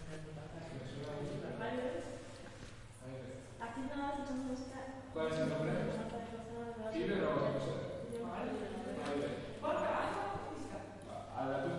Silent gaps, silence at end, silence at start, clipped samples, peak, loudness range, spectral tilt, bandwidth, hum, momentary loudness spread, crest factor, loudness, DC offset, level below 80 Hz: none; 0 s; 0 s; under 0.1%; -22 dBFS; 6 LU; -6.5 dB/octave; 11.5 kHz; none; 12 LU; 18 dB; -41 LUFS; under 0.1%; -60 dBFS